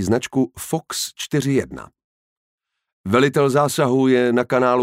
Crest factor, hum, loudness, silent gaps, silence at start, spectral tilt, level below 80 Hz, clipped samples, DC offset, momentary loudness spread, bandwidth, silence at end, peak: 16 dB; none; -19 LUFS; 2.04-2.58 s, 2.93-3.04 s; 0 s; -5.5 dB/octave; -54 dBFS; under 0.1%; under 0.1%; 10 LU; 16 kHz; 0 s; -4 dBFS